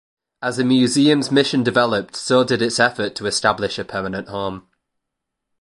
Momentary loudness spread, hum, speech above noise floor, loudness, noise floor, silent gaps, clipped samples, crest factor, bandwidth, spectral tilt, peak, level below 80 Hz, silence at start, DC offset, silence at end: 11 LU; none; 62 dB; -19 LUFS; -80 dBFS; none; under 0.1%; 18 dB; 11.5 kHz; -4.5 dB/octave; -2 dBFS; -54 dBFS; 0.4 s; under 0.1%; 1 s